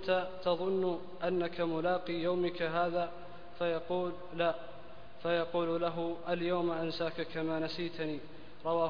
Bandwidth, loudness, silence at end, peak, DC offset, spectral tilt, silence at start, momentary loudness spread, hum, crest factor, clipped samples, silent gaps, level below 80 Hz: 5.2 kHz; -35 LUFS; 0 s; -18 dBFS; 0.6%; -4 dB/octave; 0 s; 10 LU; none; 16 dB; under 0.1%; none; -64 dBFS